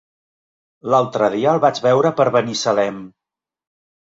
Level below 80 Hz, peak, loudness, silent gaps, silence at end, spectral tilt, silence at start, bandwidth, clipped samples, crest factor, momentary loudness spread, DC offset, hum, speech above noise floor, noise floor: -62 dBFS; -2 dBFS; -17 LUFS; none; 1.1 s; -5 dB/octave; 0.85 s; 7.8 kHz; under 0.1%; 18 dB; 7 LU; under 0.1%; none; 70 dB; -87 dBFS